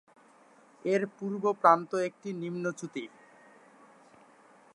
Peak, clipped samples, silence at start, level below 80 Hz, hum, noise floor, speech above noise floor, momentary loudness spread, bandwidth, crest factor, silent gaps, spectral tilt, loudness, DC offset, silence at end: -6 dBFS; under 0.1%; 0.85 s; -88 dBFS; none; -60 dBFS; 30 dB; 16 LU; 11.5 kHz; 26 dB; none; -6 dB/octave; -30 LUFS; under 0.1%; 1.7 s